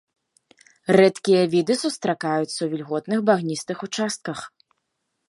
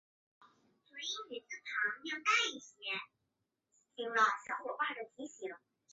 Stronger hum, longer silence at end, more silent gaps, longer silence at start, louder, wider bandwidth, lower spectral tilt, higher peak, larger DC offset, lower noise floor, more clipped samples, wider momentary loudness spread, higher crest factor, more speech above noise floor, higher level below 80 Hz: neither; first, 0.8 s vs 0.35 s; neither; first, 0.9 s vs 0.4 s; first, -22 LUFS vs -36 LUFS; first, 11.5 kHz vs 8 kHz; first, -5 dB/octave vs 2.5 dB/octave; first, -2 dBFS vs -18 dBFS; neither; second, -76 dBFS vs -86 dBFS; neither; second, 13 LU vs 17 LU; about the same, 20 dB vs 22 dB; first, 55 dB vs 48 dB; first, -70 dBFS vs under -90 dBFS